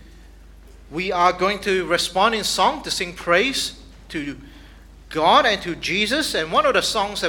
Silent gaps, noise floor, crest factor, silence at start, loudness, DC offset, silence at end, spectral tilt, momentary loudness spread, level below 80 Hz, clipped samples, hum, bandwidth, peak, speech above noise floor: none; -44 dBFS; 20 dB; 0 s; -20 LUFS; under 0.1%; 0 s; -2.5 dB/octave; 14 LU; -44 dBFS; under 0.1%; none; 19 kHz; -2 dBFS; 24 dB